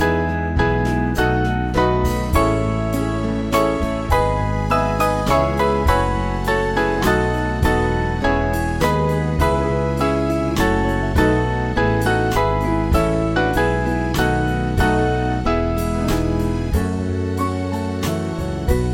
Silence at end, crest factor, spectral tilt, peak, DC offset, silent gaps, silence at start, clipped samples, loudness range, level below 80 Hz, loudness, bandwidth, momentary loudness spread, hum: 0 s; 16 dB; -6.5 dB/octave; -2 dBFS; under 0.1%; none; 0 s; under 0.1%; 2 LU; -26 dBFS; -19 LUFS; 17 kHz; 4 LU; none